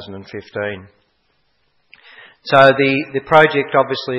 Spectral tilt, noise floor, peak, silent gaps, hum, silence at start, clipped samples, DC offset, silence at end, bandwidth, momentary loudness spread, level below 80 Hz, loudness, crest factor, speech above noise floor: -6.5 dB/octave; -63 dBFS; 0 dBFS; none; none; 0 s; 0.1%; under 0.1%; 0 s; 9.4 kHz; 21 LU; -58 dBFS; -14 LUFS; 18 dB; 48 dB